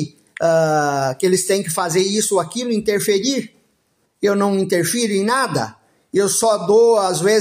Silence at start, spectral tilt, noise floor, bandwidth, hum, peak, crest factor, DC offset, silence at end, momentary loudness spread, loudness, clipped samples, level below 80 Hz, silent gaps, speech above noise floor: 0 s; -4 dB/octave; -65 dBFS; 16 kHz; none; -4 dBFS; 14 dB; under 0.1%; 0 s; 7 LU; -17 LUFS; under 0.1%; -62 dBFS; none; 48 dB